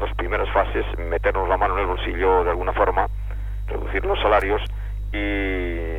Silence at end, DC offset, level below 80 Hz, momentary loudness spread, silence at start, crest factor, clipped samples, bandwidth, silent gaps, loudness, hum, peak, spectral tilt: 0 s; under 0.1%; -28 dBFS; 11 LU; 0 s; 16 dB; under 0.1%; 4.1 kHz; none; -23 LUFS; 50 Hz at -25 dBFS; -6 dBFS; -7.5 dB/octave